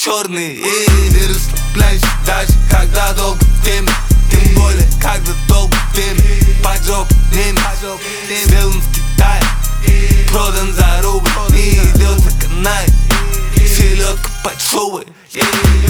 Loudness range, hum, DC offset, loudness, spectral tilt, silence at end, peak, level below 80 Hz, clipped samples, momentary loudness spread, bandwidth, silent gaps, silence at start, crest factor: 1 LU; none; under 0.1%; -13 LUFS; -4 dB/octave; 0 s; 0 dBFS; -12 dBFS; under 0.1%; 6 LU; 19.5 kHz; none; 0 s; 10 dB